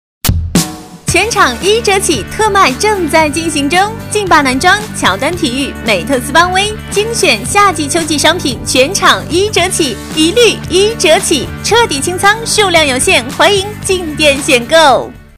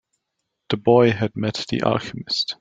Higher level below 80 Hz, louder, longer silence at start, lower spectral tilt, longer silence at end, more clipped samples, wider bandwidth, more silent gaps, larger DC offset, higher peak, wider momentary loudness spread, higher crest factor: first, -30 dBFS vs -56 dBFS; first, -10 LUFS vs -21 LUFS; second, 0.25 s vs 0.7 s; second, -3 dB/octave vs -6 dB/octave; about the same, 0.15 s vs 0.05 s; first, 0.7% vs under 0.1%; first, 16.5 kHz vs 7.8 kHz; neither; neither; about the same, 0 dBFS vs -2 dBFS; second, 6 LU vs 10 LU; second, 10 dB vs 20 dB